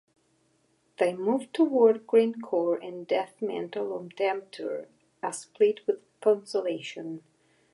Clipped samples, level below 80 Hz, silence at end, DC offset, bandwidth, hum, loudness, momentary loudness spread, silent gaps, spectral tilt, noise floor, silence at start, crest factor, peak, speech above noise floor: under 0.1%; -86 dBFS; 0.55 s; under 0.1%; 11.5 kHz; none; -28 LUFS; 13 LU; none; -5 dB/octave; -69 dBFS; 1 s; 18 dB; -10 dBFS; 42 dB